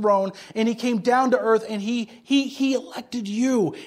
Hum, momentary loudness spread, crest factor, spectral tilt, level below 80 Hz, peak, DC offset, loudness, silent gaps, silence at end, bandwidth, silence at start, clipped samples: none; 9 LU; 16 dB; -5 dB/octave; -70 dBFS; -6 dBFS; under 0.1%; -23 LUFS; none; 0 s; 15 kHz; 0 s; under 0.1%